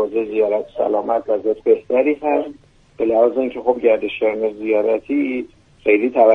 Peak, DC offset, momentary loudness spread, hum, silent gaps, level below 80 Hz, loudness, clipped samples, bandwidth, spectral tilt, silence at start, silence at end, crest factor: 0 dBFS; under 0.1%; 7 LU; none; none; -56 dBFS; -18 LUFS; under 0.1%; 4.1 kHz; -7 dB/octave; 0 s; 0 s; 16 dB